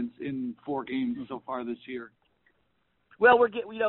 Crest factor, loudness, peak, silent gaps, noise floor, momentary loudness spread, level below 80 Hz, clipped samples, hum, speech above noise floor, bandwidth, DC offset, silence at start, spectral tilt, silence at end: 22 dB; -27 LUFS; -8 dBFS; none; -74 dBFS; 17 LU; -68 dBFS; under 0.1%; none; 48 dB; 4.2 kHz; under 0.1%; 0 s; -3 dB/octave; 0 s